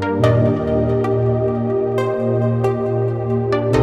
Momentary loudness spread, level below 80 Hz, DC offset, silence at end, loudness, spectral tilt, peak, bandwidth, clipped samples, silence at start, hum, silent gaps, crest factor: 4 LU; -38 dBFS; under 0.1%; 0 s; -18 LUFS; -9 dB/octave; -2 dBFS; 8.6 kHz; under 0.1%; 0 s; none; none; 14 dB